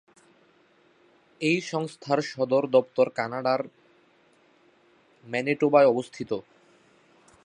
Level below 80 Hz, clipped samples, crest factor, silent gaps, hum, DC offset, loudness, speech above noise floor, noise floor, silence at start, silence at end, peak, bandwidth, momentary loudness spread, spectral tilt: -76 dBFS; under 0.1%; 22 dB; none; none; under 0.1%; -25 LUFS; 37 dB; -62 dBFS; 1.4 s; 1.05 s; -6 dBFS; 10.5 kHz; 13 LU; -5.5 dB/octave